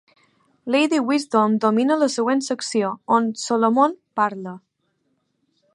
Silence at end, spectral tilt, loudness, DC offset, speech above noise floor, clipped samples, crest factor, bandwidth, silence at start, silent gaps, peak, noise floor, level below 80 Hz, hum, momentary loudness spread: 1.15 s; -4.5 dB/octave; -20 LUFS; under 0.1%; 50 dB; under 0.1%; 18 dB; 11.5 kHz; 0.65 s; none; -4 dBFS; -70 dBFS; -76 dBFS; none; 6 LU